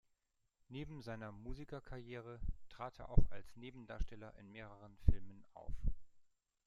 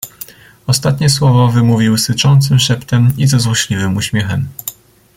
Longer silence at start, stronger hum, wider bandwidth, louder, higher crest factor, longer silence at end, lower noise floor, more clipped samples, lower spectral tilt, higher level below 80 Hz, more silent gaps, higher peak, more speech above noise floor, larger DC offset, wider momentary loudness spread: first, 0.7 s vs 0.05 s; neither; second, 5.4 kHz vs 17 kHz; second, -47 LUFS vs -12 LUFS; first, 24 dB vs 12 dB; about the same, 0.45 s vs 0.45 s; first, -83 dBFS vs -35 dBFS; neither; first, -8 dB/octave vs -5 dB/octave; about the same, -44 dBFS vs -42 dBFS; neither; second, -14 dBFS vs 0 dBFS; first, 45 dB vs 23 dB; neither; about the same, 15 LU vs 16 LU